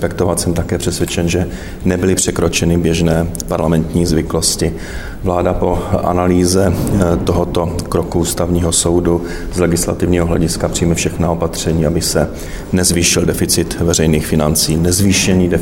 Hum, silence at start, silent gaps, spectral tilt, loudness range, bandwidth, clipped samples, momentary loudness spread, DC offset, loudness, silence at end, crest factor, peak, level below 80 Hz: none; 0 s; none; -4.5 dB/octave; 2 LU; 17 kHz; under 0.1%; 6 LU; under 0.1%; -14 LUFS; 0 s; 14 dB; 0 dBFS; -28 dBFS